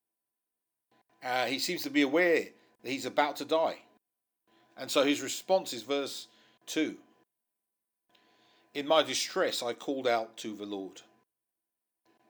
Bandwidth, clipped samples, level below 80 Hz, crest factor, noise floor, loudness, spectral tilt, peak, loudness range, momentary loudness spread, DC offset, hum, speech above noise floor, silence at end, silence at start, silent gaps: over 20 kHz; under 0.1%; under -90 dBFS; 24 dB; -88 dBFS; -31 LUFS; -2.5 dB/octave; -10 dBFS; 5 LU; 16 LU; under 0.1%; none; 57 dB; 1.3 s; 1.2 s; none